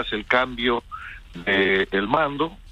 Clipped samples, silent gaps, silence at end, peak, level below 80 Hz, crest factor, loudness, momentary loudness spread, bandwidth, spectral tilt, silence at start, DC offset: under 0.1%; none; 0 s; -4 dBFS; -46 dBFS; 20 dB; -22 LUFS; 16 LU; 9 kHz; -6 dB/octave; 0 s; under 0.1%